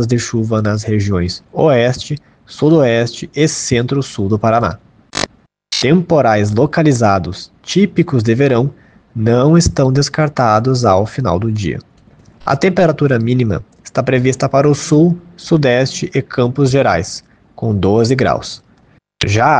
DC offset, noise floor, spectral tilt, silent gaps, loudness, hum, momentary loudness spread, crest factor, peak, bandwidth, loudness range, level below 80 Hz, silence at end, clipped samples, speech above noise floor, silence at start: under 0.1%; -50 dBFS; -6 dB/octave; none; -14 LUFS; none; 11 LU; 14 dB; 0 dBFS; 9.8 kHz; 2 LU; -40 dBFS; 0 s; under 0.1%; 37 dB; 0 s